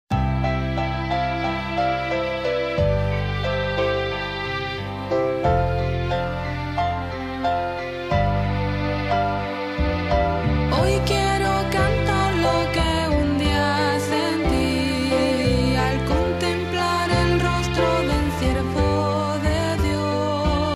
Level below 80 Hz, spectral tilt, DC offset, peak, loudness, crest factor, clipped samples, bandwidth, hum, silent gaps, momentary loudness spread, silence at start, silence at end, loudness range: -30 dBFS; -6 dB/octave; under 0.1%; -6 dBFS; -22 LUFS; 14 dB; under 0.1%; 15.5 kHz; none; none; 5 LU; 0.1 s; 0 s; 3 LU